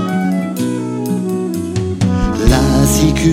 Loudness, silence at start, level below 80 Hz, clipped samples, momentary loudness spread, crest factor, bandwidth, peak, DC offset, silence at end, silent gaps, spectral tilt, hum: -15 LUFS; 0 s; -22 dBFS; under 0.1%; 7 LU; 14 dB; 16.5 kHz; 0 dBFS; under 0.1%; 0 s; none; -5.5 dB/octave; none